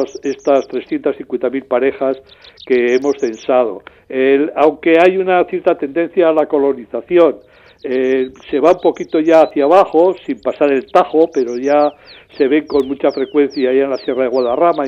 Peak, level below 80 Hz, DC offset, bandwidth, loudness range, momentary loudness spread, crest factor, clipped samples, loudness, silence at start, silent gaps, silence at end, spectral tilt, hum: 0 dBFS; -56 dBFS; under 0.1%; 7.6 kHz; 4 LU; 9 LU; 14 dB; under 0.1%; -14 LUFS; 0 s; none; 0 s; -6 dB/octave; none